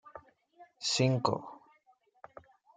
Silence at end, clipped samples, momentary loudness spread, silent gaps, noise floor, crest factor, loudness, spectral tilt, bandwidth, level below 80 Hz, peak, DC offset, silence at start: 1.2 s; under 0.1%; 26 LU; none; -69 dBFS; 24 dB; -31 LUFS; -4.5 dB/octave; 9.4 kHz; -76 dBFS; -12 dBFS; under 0.1%; 0.05 s